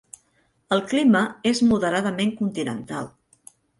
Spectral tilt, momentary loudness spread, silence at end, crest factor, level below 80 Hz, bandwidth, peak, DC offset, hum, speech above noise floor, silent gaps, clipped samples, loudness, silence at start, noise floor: -5 dB/octave; 13 LU; 0.7 s; 16 dB; -60 dBFS; 11.5 kHz; -8 dBFS; under 0.1%; none; 44 dB; none; under 0.1%; -22 LUFS; 0.7 s; -66 dBFS